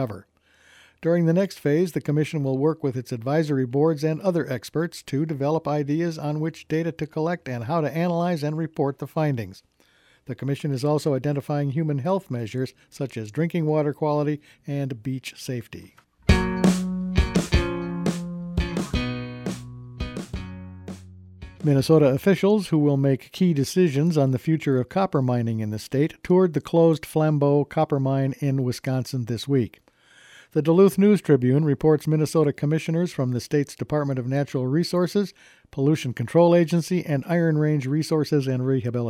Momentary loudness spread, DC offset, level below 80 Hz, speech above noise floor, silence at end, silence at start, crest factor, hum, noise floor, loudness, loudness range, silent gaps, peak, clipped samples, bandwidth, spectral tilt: 12 LU; under 0.1%; -40 dBFS; 37 dB; 0 s; 0 s; 20 dB; none; -60 dBFS; -23 LUFS; 6 LU; none; -4 dBFS; under 0.1%; 15.5 kHz; -7.5 dB/octave